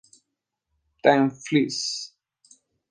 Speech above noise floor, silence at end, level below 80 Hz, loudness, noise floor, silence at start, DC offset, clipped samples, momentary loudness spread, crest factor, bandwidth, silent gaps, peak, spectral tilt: 60 dB; 0.85 s; -72 dBFS; -23 LUFS; -82 dBFS; 1.05 s; under 0.1%; under 0.1%; 12 LU; 22 dB; 10 kHz; none; -4 dBFS; -4.5 dB/octave